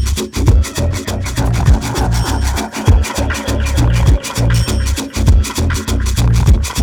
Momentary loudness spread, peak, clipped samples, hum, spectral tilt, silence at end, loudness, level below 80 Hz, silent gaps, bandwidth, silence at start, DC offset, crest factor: 5 LU; 0 dBFS; under 0.1%; none; -5 dB/octave; 0 s; -15 LUFS; -16 dBFS; none; 19 kHz; 0 s; under 0.1%; 12 dB